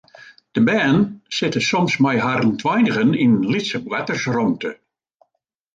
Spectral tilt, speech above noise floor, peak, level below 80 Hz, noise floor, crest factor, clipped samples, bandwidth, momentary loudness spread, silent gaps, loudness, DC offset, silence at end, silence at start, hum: -5.5 dB/octave; 56 dB; -4 dBFS; -58 dBFS; -74 dBFS; 14 dB; under 0.1%; 7.8 kHz; 7 LU; none; -19 LUFS; under 0.1%; 1 s; 0.2 s; none